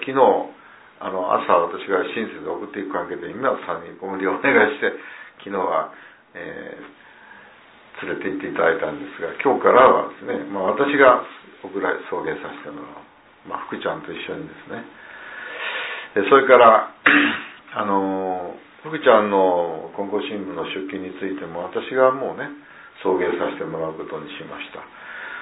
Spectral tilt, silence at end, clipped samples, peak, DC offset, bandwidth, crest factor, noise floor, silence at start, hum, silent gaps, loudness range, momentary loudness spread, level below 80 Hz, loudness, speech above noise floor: -8.5 dB/octave; 0 s; under 0.1%; 0 dBFS; under 0.1%; 4 kHz; 22 dB; -48 dBFS; 0 s; none; none; 12 LU; 20 LU; -64 dBFS; -20 LUFS; 28 dB